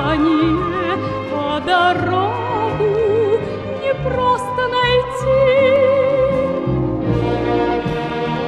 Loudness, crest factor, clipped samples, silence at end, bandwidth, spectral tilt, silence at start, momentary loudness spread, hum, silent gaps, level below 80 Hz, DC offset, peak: -17 LUFS; 12 dB; under 0.1%; 0 s; 11 kHz; -7 dB/octave; 0 s; 7 LU; none; none; -36 dBFS; under 0.1%; -4 dBFS